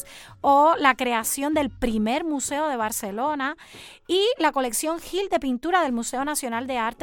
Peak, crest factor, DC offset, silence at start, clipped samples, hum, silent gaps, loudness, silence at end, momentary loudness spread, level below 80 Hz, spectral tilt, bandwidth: -2 dBFS; 20 dB; under 0.1%; 0 s; under 0.1%; none; none; -23 LUFS; 0 s; 9 LU; -48 dBFS; -2.5 dB/octave; 17.5 kHz